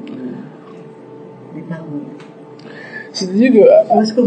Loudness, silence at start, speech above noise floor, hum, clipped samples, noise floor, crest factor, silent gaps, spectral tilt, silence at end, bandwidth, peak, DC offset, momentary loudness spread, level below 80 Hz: -12 LUFS; 0 s; 23 dB; none; under 0.1%; -36 dBFS; 16 dB; none; -6 dB/octave; 0 s; 9 kHz; 0 dBFS; under 0.1%; 28 LU; -70 dBFS